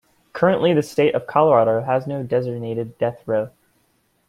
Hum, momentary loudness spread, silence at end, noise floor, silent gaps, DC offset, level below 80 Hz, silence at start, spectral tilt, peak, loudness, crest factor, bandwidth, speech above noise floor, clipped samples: none; 11 LU; 0.8 s; -64 dBFS; none; under 0.1%; -60 dBFS; 0.35 s; -7 dB/octave; -2 dBFS; -20 LUFS; 18 dB; 14 kHz; 45 dB; under 0.1%